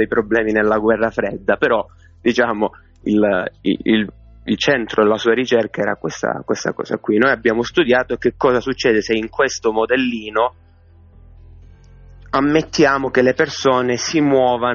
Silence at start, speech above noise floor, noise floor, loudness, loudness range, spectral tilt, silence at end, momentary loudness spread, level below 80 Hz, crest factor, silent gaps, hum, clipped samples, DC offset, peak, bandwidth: 0 s; 30 dB; -47 dBFS; -17 LUFS; 3 LU; -3.5 dB/octave; 0 s; 7 LU; -46 dBFS; 16 dB; none; none; under 0.1%; under 0.1%; 0 dBFS; 7.2 kHz